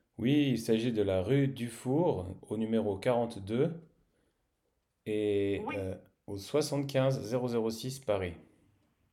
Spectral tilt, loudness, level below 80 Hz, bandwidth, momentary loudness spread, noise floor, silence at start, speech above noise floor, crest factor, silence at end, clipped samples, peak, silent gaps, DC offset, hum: -6.5 dB/octave; -32 LUFS; -70 dBFS; 15.5 kHz; 10 LU; -79 dBFS; 0.2 s; 48 dB; 16 dB; 0.7 s; under 0.1%; -16 dBFS; none; under 0.1%; none